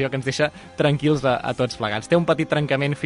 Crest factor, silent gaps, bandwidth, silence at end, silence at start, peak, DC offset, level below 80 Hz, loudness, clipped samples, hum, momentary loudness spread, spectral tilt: 16 dB; none; 11 kHz; 0 s; 0 s; -6 dBFS; under 0.1%; -52 dBFS; -22 LUFS; under 0.1%; none; 5 LU; -6 dB/octave